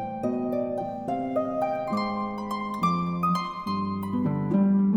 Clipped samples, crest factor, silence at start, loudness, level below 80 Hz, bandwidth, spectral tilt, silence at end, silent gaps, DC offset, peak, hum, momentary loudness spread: under 0.1%; 14 dB; 0 s; -27 LUFS; -58 dBFS; 14 kHz; -8 dB/octave; 0 s; none; under 0.1%; -12 dBFS; none; 7 LU